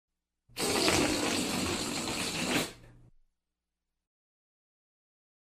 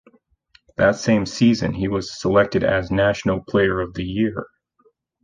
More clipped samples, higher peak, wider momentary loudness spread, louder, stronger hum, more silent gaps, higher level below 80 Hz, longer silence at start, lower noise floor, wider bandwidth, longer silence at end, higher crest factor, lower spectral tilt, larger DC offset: neither; second, -10 dBFS vs -4 dBFS; about the same, 8 LU vs 7 LU; second, -30 LUFS vs -20 LUFS; neither; neither; second, -58 dBFS vs -44 dBFS; second, 0.55 s vs 0.8 s; first, -87 dBFS vs -62 dBFS; first, 16 kHz vs 9.4 kHz; first, 2.55 s vs 0.8 s; first, 24 dB vs 18 dB; second, -2.5 dB/octave vs -6 dB/octave; neither